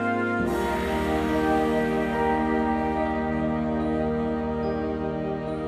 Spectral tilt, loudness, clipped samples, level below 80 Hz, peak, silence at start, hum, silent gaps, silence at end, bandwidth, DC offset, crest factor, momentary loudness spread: -7 dB/octave; -25 LUFS; under 0.1%; -40 dBFS; -12 dBFS; 0 s; none; none; 0 s; 15 kHz; under 0.1%; 14 dB; 5 LU